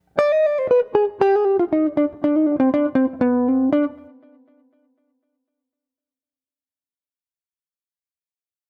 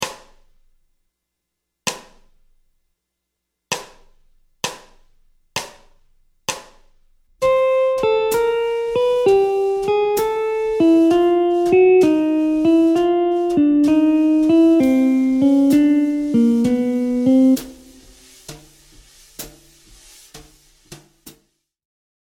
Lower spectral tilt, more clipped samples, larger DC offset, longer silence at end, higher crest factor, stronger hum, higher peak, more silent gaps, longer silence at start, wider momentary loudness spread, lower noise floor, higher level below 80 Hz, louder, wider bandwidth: first, -8 dB/octave vs -5 dB/octave; neither; neither; first, 4.75 s vs 0.95 s; about the same, 20 dB vs 16 dB; neither; about the same, -2 dBFS vs -2 dBFS; neither; first, 0.15 s vs 0 s; second, 3 LU vs 15 LU; first, under -90 dBFS vs -79 dBFS; second, -62 dBFS vs -52 dBFS; about the same, -19 LUFS vs -17 LUFS; second, 6.6 kHz vs 17 kHz